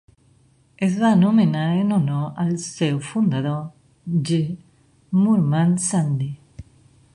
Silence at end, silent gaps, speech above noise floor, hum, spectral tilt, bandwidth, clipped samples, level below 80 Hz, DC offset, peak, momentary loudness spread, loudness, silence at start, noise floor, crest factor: 0.55 s; none; 38 dB; none; -6.5 dB/octave; 11 kHz; under 0.1%; -56 dBFS; under 0.1%; -6 dBFS; 12 LU; -21 LUFS; 0.8 s; -57 dBFS; 14 dB